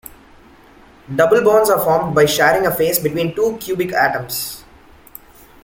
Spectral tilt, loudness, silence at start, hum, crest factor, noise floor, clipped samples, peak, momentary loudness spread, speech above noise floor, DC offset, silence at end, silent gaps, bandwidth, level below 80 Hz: -4 dB/octave; -16 LUFS; 1.1 s; none; 16 dB; -45 dBFS; under 0.1%; -2 dBFS; 11 LU; 30 dB; under 0.1%; 1.05 s; none; 17 kHz; -48 dBFS